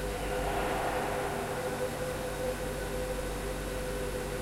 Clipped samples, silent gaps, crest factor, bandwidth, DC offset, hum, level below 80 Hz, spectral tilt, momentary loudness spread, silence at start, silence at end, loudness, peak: under 0.1%; none; 12 dB; 16 kHz; under 0.1%; none; -42 dBFS; -4.5 dB/octave; 4 LU; 0 s; 0 s; -34 LUFS; -20 dBFS